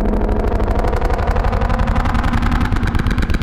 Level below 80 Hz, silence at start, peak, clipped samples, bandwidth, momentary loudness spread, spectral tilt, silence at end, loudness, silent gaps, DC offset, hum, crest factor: -18 dBFS; 0 s; -2 dBFS; under 0.1%; 11.5 kHz; 1 LU; -7.5 dB/octave; 0 s; -18 LUFS; none; under 0.1%; none; 12 dB